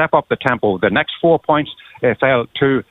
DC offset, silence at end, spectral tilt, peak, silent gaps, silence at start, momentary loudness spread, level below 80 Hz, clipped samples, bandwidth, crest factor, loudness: under 0.1%; 0.1 s; -8 dB/octave; 0 dBFS; none; 0 s; 4 LU; -50 dBFS; under 0.1%; 4.7 kHz; 16 dB; -16 LUFS